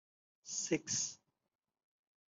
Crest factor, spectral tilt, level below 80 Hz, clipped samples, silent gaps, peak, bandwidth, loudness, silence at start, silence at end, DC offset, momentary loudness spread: 24 dB; -2 dB/octave; -82 dBFS; under 0.1%; none; -20 dBFS; 8.2 kHz; -38 LUFS; 0.45 s; 1.15 s; under 0.1%; 21 LU